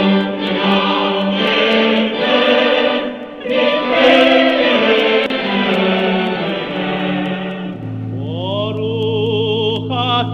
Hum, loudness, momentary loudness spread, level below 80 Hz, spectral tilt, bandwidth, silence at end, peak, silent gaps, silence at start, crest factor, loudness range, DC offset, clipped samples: none; -15 LUFS; 11 LU; -52 dBFS; -6.5 dB/octave; 7.8 kHz; 0 s; 0 dBFS; none; 0 s; 14 dB; 6 LU; under 0.1%; under 0.1%